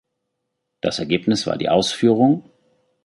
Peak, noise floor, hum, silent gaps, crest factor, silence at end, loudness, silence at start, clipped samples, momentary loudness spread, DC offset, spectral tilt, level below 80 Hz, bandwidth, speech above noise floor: -2 dBFS; -77 dBFS; none; none; 18 dB; 0.65 s; -19 LUFS; 0.85 s; under 0.1%; 9 LU; under 0.1%; -5.5 dB/octave; -56 dBFS; 11.5 kHz; 59 dB